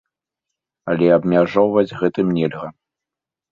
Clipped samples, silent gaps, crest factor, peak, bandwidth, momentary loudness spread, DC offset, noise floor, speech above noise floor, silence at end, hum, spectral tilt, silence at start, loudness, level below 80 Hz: under 0.1%; none; 18 dB; -2 dBFS; 7 kHz; 16 LU; under 0.1%; -87 dBFS; 70 dB; 0.8 s; none; -9 dB/octave; 0.85 s; -17 LUFS; -56 dBFS